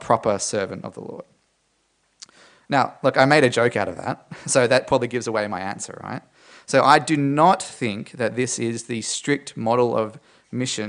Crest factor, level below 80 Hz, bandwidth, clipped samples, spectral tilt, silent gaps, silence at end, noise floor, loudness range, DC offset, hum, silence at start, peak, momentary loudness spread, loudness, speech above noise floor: 22 dB; -62 dBFS; 10.5 kHz; under 0.1%; -4 dB/octave; none; 0 s; -67 dBFS; 4 LU; under 0.1%; none; 0 s; 0 dBFS; 16 LU; -21 LUFS; 46 dB